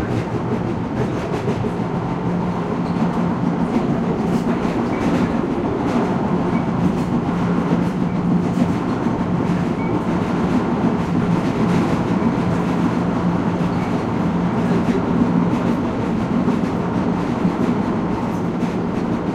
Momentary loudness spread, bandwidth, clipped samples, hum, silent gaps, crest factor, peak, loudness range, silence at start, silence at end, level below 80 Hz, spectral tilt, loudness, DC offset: 4 LU; 9.6 kHz; under 0.1%; none; none; 14 dB; -4 dBFS; 2 LU; 0 s; 0 s; -40 dBFS; -8 dB/octave; -20 LUFS; under 0.1%